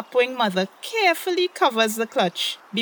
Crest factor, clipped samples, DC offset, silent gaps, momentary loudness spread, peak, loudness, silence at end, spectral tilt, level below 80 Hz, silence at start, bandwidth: 18 dB; under 0.1%; under 0.1%; none; 6 LU; -4 dBFS; -22 LUFS; 0 s; -3.5 dB/octave; -78 dBFS; 0 s; over 20 kHz